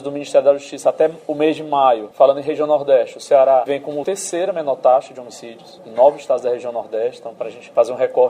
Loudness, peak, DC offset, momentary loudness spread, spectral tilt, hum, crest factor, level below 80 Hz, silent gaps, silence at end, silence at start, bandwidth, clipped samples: -17 LUFS; 0 dBFS; under 0.1%; 14 LU; -4.5 dB/octave; none; 16 dB; -72 dBFS; none; 0 s; 0 s; 14 kHz; under 0.1%